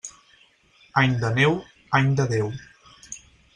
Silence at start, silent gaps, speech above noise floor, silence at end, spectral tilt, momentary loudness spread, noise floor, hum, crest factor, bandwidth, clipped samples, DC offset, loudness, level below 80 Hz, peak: 0.05 s; none; 37 dB; 0.35 s; -5.5 dB/octave; 19 LU; -58 dBFS; none; 20 dB; 10 kHz; under 0.1%; under 0.1%; -22 LUFS; -56 dBFS; -6 dBFS